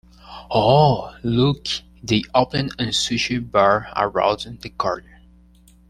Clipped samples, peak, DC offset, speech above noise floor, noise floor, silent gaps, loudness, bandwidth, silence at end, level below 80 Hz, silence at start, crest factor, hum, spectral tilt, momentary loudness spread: under 0.1%; -2 dBFS; under 0.1%; 31 dB; -51 dBFS; none; -20 LUFS; 13 kHz; 0.9 s; -46 dBFS; 0.25 s; 20 dB; 60 Hz at -45 dBFS; -5 dB/octave; 11 LU